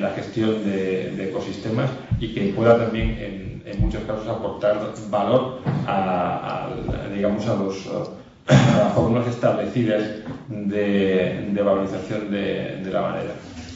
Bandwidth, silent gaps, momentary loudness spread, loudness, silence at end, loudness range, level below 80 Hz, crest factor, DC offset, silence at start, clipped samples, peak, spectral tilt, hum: 7.8 kHz; none; 12 LU; -23 LUFS; 0 s; 3 LU; -38 dBFS; 18 dB; under 0.1%; 0 s; under 0.1%; -4 dBFS; -7 dB/octave; none